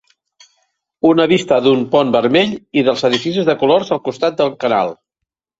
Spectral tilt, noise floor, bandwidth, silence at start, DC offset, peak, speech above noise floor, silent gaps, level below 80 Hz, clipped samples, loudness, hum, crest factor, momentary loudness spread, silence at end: -5.5 dB/octave; -80 dBFS; 8 kHz; 1.05 s; under 0.1%; 0 dBFS; 66 dB; none; -58 dBFS; under 0.1%; -15 LUFS; none; 14 dB; 5 LU; 0.65 s